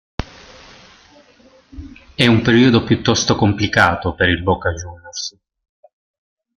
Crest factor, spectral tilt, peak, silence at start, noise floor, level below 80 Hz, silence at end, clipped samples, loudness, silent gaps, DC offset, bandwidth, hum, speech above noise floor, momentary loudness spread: 18 dB; -5 dB/octave; 0 dBFS; 0.2 s; -50 dBFS; -42 dBFS; 1.3 s; under 0.1%; -15 LUFS; none; under 0.1%; 11 kHz; none; 35 dB; 19 LU